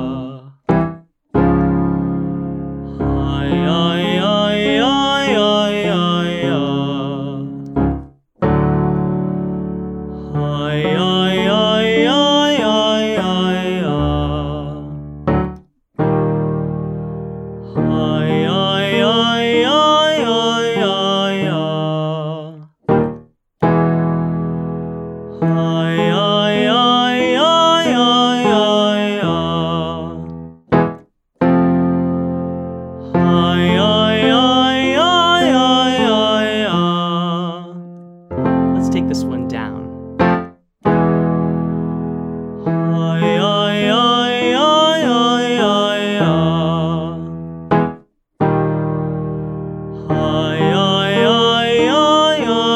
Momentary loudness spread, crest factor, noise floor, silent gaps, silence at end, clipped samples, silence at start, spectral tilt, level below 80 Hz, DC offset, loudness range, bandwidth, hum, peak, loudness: 13 LU; 14 dB; -38 dBFS; none; 0 s; under 0.1%; 0 s; -6 dB/octave; -38 dBFS; under 0.1%; 6 LU; 10 kHz; none; -2 dBFS; -16 LUFS